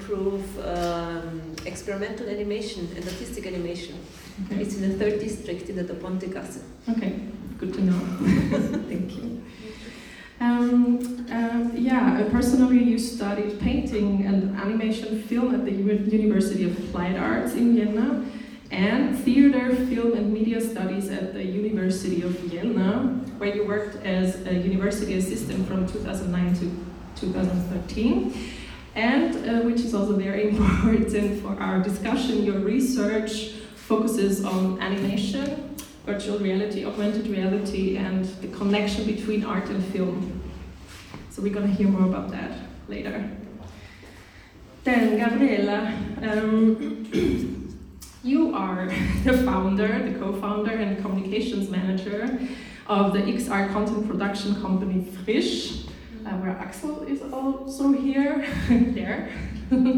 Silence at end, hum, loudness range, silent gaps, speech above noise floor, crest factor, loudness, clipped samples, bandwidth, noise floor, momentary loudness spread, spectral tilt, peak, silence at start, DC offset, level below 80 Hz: 0 s; none; 6 LU; none; 23 dB; 18 dB; -25 LUFS; under 0.1%; 18 kHz; -47 dBFS; 13 LU; -6.5 dB/octave; -6 dBFS; 0 s; under 0.1%; -44 dBFS